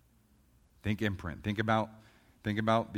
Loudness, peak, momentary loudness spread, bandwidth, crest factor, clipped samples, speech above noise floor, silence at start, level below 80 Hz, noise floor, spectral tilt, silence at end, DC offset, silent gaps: -34 LUFS; -14 dBFS; 11 LU; 15.5 kHz; 22 dB; under 0.1%; 34 dB; 0.85 s; -58 dBFS; -66 dBFS; -7 dB/octave; 0 s; under 0.1%; none